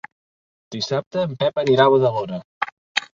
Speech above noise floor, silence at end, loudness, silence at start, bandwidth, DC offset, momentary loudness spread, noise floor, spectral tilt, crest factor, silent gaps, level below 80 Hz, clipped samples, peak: over 71 dB; 0.1 s; -20 LUFS; 0.7 s; 7.6 kHz; under 0.1%; 14 LU; under -90 dBFS; -5.5 dB/octave; 20 dB; 1.06-1.11 s, 2.45-2.61 s, 2.72-2.95 s; -62 dBFS; under 0.1%; -2 dBFS